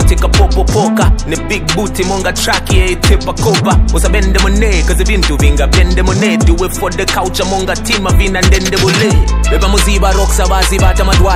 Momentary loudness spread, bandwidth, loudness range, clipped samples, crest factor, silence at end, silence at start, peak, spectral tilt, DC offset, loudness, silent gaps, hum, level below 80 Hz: 4 LU; 15.5 kHz; 1 LU; 0.5%; 10 dB; 0 s; 0 s; 0 dBFS; -4.5 dB/octave; under 0.1%; -11 LUFS; none; none; -12 dBFS